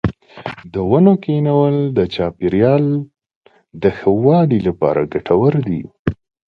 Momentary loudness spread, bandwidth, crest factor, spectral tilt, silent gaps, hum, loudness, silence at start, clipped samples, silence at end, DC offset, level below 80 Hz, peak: 11 LU; 5.8 kHz; 16 dB; -10.5 dB/octave; 3.36-3.41 s, 5.99-6.05 s; none; -16 LUFS; 0.05 s; under 0.1%; 0.4 s; under 0.1%; -42 dBFS; 0 dBFS